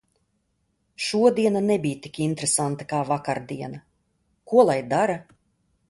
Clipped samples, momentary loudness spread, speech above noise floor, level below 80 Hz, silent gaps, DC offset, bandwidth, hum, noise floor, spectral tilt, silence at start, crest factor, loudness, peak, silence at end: under 0.1%; 15 LU; 49 dB; -64 dBFS; none; under 0.1%; 11.5 kHz; none; -72 dBFS; -4.5 dB/octave; 1 s; 20 dB; -23 LUFS; -4 dBFS; 0.7 s